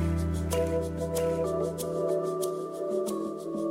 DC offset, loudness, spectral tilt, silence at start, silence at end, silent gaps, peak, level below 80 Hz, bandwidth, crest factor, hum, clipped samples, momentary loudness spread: under 0.1%; -30 LUFS; -6.5 dB/octave; 0 s; 0 s; none; -16 dBFS; -42 dBFS; 16 kHz; 14 dB; none; under 0.1%; 4 LU